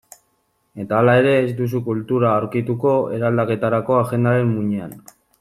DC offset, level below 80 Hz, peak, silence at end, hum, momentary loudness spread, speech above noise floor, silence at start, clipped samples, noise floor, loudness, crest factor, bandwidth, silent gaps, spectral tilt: under 0.1%; -56 dBFS; -2 dBFS; 0.4 s; none; 8 LU; 48 dB; 0.75 s; under 0.1%; -66 dBFS; -19 LUFS; 16 dB; 14 kHz; none; -8 dB/octave